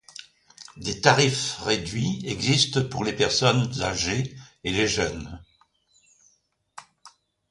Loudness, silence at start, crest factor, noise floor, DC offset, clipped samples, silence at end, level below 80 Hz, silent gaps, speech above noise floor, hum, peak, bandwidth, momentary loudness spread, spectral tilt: -24 LUFS; 0.2 s; 24 dB; -68 dBFS; under 0.1%; under 0.1%; 0.4 s; -50 dBFS; none; 44 dB; none; -2 dBFS; 11.5 kHz; 17 LU; -4 dB/octave